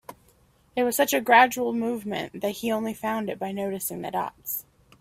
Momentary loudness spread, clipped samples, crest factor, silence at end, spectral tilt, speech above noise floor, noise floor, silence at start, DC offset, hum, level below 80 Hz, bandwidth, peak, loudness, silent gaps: 14 LU; under 0.1%; 22 dB; 0.4 s; -3.5 dB/octave; 36 dB; -61 dBFS; 0.1 s; under 0.1%; none; -64 dBFS; 16 kHz; -4 dBFS; -25 LUFS; none